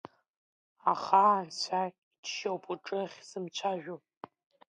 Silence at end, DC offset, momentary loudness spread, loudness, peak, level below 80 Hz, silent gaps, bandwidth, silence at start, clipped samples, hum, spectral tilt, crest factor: 0.75 s; under 0.1%; 21 LU; -32 LUFS; -10 dBFS; -88 dBFS; 1.98-2.11 s, 2.18-2.23 s; 10 kHz; 0.85 s; under 0.1%; none; -3.5 dB/octave; 24 dB